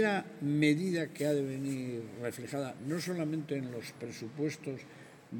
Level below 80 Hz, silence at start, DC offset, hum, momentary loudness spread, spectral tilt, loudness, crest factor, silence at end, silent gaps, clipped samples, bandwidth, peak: -78 dBFS; 0 s; under 0.1%; none; 14 LU; -6 dB/octave; -35 LUFS; 20 dB; 0 s; none; under 0.1%; 17 kHz; -14 dBFS